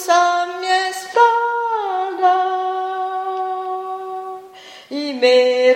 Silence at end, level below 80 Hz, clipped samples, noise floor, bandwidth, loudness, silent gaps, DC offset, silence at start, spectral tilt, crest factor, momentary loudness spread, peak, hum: 0 s; -78 dBFS; under 0.1%; -40 dBFS; 16 kHz; -18 LUFS; none; under 0.1%; 0 s; -1 dB/octave; 16 dB; 15 LU; -2 dBFS; none